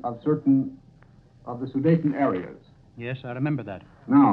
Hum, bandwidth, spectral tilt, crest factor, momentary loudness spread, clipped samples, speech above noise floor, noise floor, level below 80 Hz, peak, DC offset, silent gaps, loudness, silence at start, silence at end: none; 4.3 kHz; -11 dB/octave; 18 dB; 17 LU; under 0.1%; 30 dB; -53 dBFS; -60 dBFS; -6 dBFS; under 0.1%; none; -25 LUFS; 0.05 s; 0 s